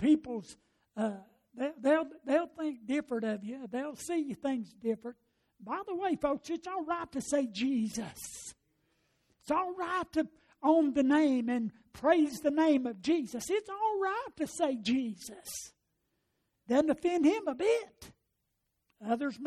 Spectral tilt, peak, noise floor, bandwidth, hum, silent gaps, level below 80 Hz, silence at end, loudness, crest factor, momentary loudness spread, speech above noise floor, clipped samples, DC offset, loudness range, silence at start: -4.5 dB/octave; -14 dBFS; -82 dBFS; 14.5 kHz; none; none; -68 dBFS; 0 s; -32 LUFS; 18 dB; 14 LU; 50 dB; under 0.1%; under 0.1%; 7 LU; 0 s